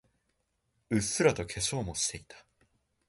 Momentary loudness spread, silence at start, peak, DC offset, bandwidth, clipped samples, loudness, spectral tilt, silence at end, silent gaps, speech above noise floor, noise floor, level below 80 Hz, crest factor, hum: 6 LU; 0.9 s; -10 dBFS; under 0.1%; 12 kHz; under 0.1%; -30 LUFS; -3.5 dB/octave; 0.7 s; none; 47 dB; -78 dBFS; -54 dBFS; 24 dB; none